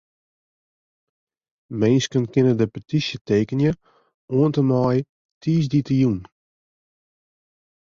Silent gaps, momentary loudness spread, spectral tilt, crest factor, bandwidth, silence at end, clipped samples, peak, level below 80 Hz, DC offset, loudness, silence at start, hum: 3.21-3.25 s, 4.14-4.28 s, 5.09-5.41 s; 9 LU; -7 dB/octave; 18 dB; 7.6 kHz; 1.7 s; under 0.1%; -6 dBFS; -54 dBFS; under 0.1%; -21 LUFS; 1.7 s; none